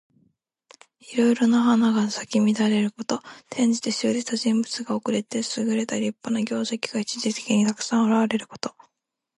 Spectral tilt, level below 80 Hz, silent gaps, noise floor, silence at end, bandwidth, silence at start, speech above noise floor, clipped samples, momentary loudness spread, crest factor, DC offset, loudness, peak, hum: -4.5 dB/octave; -72 dBFS; none; -81 dBFS; 0.65 s; 11.5 kHz; 1.05 s; 58 dB; under 0.1%; 9 LU; 16 dB; under 0.1%; -23 LUFS; -8 dBFS; none